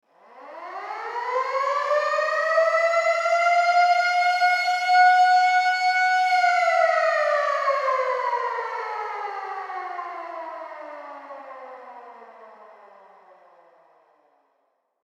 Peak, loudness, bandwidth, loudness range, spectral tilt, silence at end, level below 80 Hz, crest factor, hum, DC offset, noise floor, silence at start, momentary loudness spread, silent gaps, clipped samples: -8 dBFS; -21 LUFS; 11.5 kHz; 18 LU; 2 dB/octave; 2.4 s; under -90 dBFS; 16 dB; none; under 0.1%; -71 dBFS; 0.35 s; 20 LU; none; under 0.1%